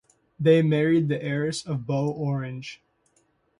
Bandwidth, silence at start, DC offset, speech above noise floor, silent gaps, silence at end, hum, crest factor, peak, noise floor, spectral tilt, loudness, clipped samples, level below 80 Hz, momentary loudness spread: 11 kHz; 0.4 s; under 0.1%; 44 dB; none; 0.85 s; none; 18 dB; -6 dBFS; -67 dBFS; -7 dB/octave; -24 LUFS; under 0.1%; -64 dBFS; 13 LU